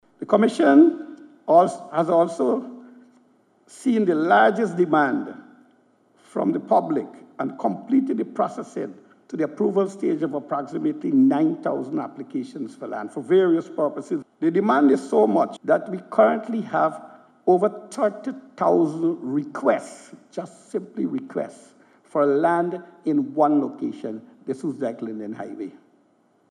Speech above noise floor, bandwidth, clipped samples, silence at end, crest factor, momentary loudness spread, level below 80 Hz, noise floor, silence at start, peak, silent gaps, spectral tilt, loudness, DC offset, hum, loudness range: 40 dB; 11 kHz; under 0.1%; 0.8 s; 20 dB; 16 LU; -84 dBFS; -62 dBFS; 0.2 s; -4 dBFS; none; -7 dB/octave; -22 LUFS; under 0.1%; none; 5 LU